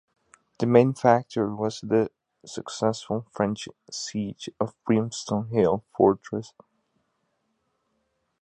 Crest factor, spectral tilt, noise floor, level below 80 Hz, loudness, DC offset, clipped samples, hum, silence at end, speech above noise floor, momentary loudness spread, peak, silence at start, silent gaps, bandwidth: 24 dB; -6 dB/octave; -74 dBFS; -62 dBFS; -25 LUFS; under 0.1%; under 0.1%; none; 1.95 s; 50 dB; 14 LU; -2 dBFS; 0.6 s; none; 10.5 kHz